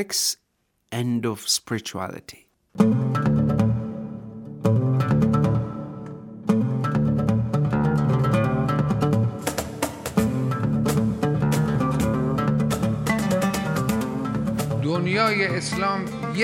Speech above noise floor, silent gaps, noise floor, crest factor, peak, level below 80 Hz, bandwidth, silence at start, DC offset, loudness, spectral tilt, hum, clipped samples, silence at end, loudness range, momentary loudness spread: 47 dB; none; -71 dBFS; 18 dB; -4 dBFS; -46 dBFS; 19 kHz; 0 s; under 0.1%; -23 LUFS; -6 dB/octave; none; under 0.1%; 0 s; 2 LU; 11 LU